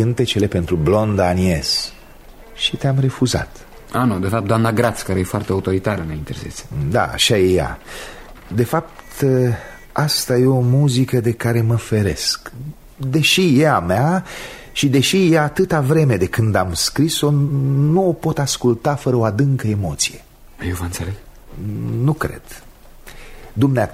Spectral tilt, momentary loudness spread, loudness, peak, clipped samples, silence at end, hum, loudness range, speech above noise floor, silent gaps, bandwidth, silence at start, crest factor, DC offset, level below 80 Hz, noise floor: -5.5 dB/octave; 14 LU; -18 LUFS; -2 dBFS; under 0.1%; 0 s; none; 5 LU; 23 dB; none; 16 kHz; 0 s; 16 dB; under 0.1%; -40 dBFS; -40 dBFS